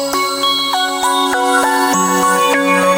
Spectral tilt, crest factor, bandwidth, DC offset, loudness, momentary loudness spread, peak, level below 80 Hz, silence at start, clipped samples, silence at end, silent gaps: -2 dB/octave; 14 dB; 17 kHz; under 0.1%; -13 LUFS; 3 LU; 0 dBFS; -54 dBFS; 0 s; under 0.1%; 0 s; none